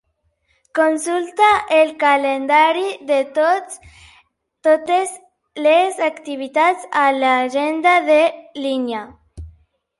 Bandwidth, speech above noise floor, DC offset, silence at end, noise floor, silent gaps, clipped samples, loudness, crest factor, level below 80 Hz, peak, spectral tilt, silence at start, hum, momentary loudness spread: 11.5 kHz; 49 dB; under 0.1%; 0.5 s; -66 dBFS; none; under 0.1%; -17 LUFS; 16 dB; -52 dBFS; -2 dBFS; -3 dB/octave; 0.75 s; none; 12 LU